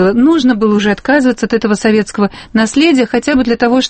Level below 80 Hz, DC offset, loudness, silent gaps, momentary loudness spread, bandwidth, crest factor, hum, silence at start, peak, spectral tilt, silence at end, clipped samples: -40 dBFS; under 0.1%; -11 LUFS; none; 5 LU; 8.8 kHz; 10 dB; none; 0 s; 0 dBFS; -5 dB/octave; 0 s; under 0.1%